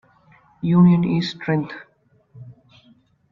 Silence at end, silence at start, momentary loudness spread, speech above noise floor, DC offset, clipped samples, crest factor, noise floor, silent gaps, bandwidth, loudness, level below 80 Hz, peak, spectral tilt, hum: 0.8 s; 0.65 s; 17 LU; 39 dB; under 0.1%; under 0.1%; 18 dB; -56 dBFS; none; 6.2 kHz; -19 LUFS; -58 dBFS; -4 dBFS; -8.5 dB/octave; none